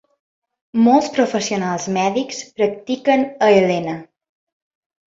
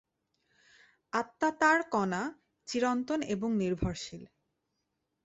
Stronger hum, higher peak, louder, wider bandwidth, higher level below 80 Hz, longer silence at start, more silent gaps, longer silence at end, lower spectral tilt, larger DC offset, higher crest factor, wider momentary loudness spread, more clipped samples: neither; first, -2 dBFS vs -12 dBFS; first, -18 LUFS vs -31 LUFS; about the same, 7.8 kHz vs 8.2 kHz; second, -62 dBFS vs -56 dBFS; second, 0.75 s vs 1.15 s; neither; about the same, 1.05 s vs 1 s; about the same, -5 dB/octave vs -5 dB/octave; neither; second, 16 dB vs 22 dB; second, 10 LU vs 15 LU; neither